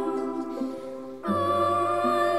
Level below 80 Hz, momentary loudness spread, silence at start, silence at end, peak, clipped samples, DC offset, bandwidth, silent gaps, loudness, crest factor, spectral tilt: -66 dBFS; 11 LU; 0 s; 0 s; -12 dBFS; under 0.1%; 0.3%; 14 kHz; none; -27 LUFS; 14 dB; -6 dB/octave